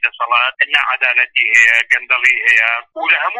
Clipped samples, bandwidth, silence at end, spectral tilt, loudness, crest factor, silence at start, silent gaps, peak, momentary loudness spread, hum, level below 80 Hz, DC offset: under 0.1%; 11.5 kHz; 0 s; 2 dB/octave; -11 LUFS; 14 dB; 0 s; none; 0 dBFS; 5 LU; none; -62 dBFS; under 0.1%